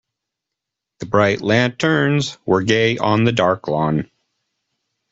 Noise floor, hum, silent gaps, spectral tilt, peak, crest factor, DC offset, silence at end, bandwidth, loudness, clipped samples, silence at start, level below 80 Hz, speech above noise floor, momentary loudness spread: -82 dBFS; none; none; -6 dB/octave; 0 dBFS; 18 dB; under 0.1%; 1.05 s; 8 kHz; -17 LUFS; under 0.1%; 1 s; -54 dBFS; 66 dB; 5 LU